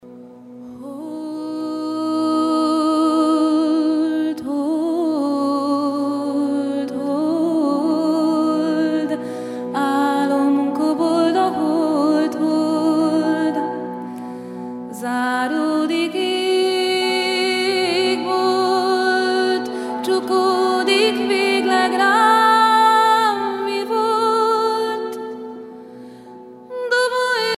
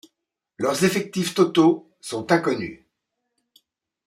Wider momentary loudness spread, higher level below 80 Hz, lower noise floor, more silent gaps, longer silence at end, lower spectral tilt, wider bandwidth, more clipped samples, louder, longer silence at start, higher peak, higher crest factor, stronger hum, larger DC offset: about the same, 13 LU vs 13 LU; second, -72 dBFS vs -66 dBFS; second, -39 dBFS vs -80 dBFS; neither; second, 0 s vs 1.35 s; about the same, -4 dB/octave vs -5 dB/octave; second, 14.5 kHz vs 16 kHz; neither; first, -18 LUFS vs -22 LUFS; second, 0.05 s vs 0.6 s; about the same, -2 dBFS vs -4 dBFS; about the same, 16 dB vs 20 dB; neither; neither